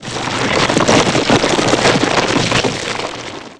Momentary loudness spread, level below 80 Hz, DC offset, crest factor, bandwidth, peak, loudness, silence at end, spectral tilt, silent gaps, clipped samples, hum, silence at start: 9 LU; -38 dBFS; 0.5%; 14 dB; 11 kHz; 0 dBFS; -13 LUFS; 0.05 s; -3.5 dB/octave; none; under 0.1%; none; 0 s